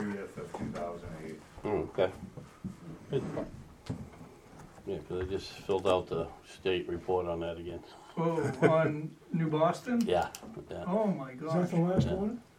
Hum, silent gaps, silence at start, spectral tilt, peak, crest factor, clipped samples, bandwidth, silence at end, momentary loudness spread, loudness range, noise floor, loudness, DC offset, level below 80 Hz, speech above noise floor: none; none; 0 s; -7 dB/octave; -10 dBFS; 24 dB; under 0.1%; 15 kHz; 0.15 s; 17 LU; 8 LU; -53 dBFS; -33 LUFS; under 0.1%; -56 dBFS; 21 dB